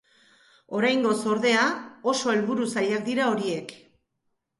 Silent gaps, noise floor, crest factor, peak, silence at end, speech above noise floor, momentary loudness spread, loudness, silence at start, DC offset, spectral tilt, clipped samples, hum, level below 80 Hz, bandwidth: none; -77 dBFS; 18 dB; -10 dBFS; 0.85 s; 53 dB; 9 LU; -25 LUFS; 0.7 s; under 0.1%; -4 dB/octave; under 0.1%; none; -72 dBFS; 11.5 kHz